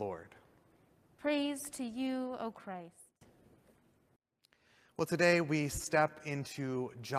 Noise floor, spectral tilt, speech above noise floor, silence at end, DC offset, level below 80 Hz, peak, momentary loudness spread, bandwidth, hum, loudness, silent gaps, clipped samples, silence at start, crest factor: -73 dBFS; -5 dB/octave; 38 dB; 0 s; under 0.1%; -64 dBFS; -14 dBFS; 18 LU; 15 kHz; none; -35 LUFS; none; under 0.1%; 0 s; 22 dB